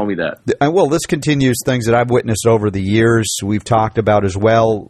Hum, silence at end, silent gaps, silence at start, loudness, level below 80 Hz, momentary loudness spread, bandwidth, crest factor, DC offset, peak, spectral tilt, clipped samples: none; 0.05 s; none; 0 s; -15 LUFS; -42 dBFS; 4 LU; 14.5 kHz; 14 dB; under 0.1%; -2 dBFS; -5.5 dB/octave; under 0.1%